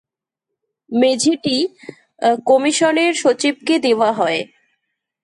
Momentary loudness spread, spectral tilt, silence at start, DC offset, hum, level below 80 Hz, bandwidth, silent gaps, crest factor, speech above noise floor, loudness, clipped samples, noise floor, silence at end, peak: 7 LU; -3 dB/octave; 0.9 s; under 0.1%; none; -68 dBFS; 11 kHz; none; 14 dB; 66 dB; -16 LUFS; under 0.1%; -82 dBFS; 0.8 s; -4 dBFS